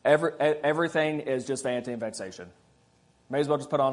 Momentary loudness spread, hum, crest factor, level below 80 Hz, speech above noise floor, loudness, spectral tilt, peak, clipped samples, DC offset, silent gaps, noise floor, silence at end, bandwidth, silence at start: 11 LU; none; 20 dB; -72 dBFS; 37 dB; -28 LUFS; -5 dB/octave; -6 dBFS; under 0.1%; under 0.1%; none; -63 dBFS; 0 s; 11 kHz; 0.05 s